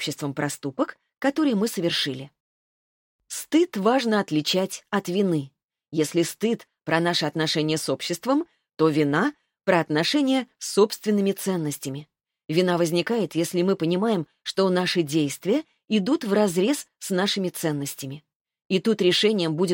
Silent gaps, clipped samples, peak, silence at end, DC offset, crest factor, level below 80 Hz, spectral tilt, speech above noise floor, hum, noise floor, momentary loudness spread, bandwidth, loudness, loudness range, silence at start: 2.40-3.19 s, 5.64-5.68 s, 18.36-18.45 s, 18.65-18.70 s; under 0.1%; -6 dBFS; 0 s; under 0.1%; 18 dB; -72 dBFS; -4.5 dB/octave; over 67 dB; none; under -90 dBFS; 9 LU; 17 kHz; -24 LUFS; 2 LU; 0 s